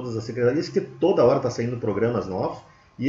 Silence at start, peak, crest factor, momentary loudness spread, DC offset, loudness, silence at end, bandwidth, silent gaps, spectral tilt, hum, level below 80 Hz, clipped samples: 0 s; -8 dBFS; 16 dB; 10 LU; under 0.1%; -23 LUFS; 0 s; 7.6 kHz; none; -7 dB/octave; none; -56 dBFS; under 0.1%